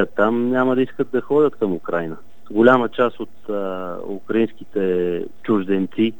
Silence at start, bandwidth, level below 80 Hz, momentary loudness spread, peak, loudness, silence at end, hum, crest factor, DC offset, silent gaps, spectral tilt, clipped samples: 0 s; 18 kHz; -64 dBFS; 12 LU; 0 dBFS; -20 LUFS; 0.05 s; none; 20 dB; 2%; none; -8 dB/octave; under 0.1%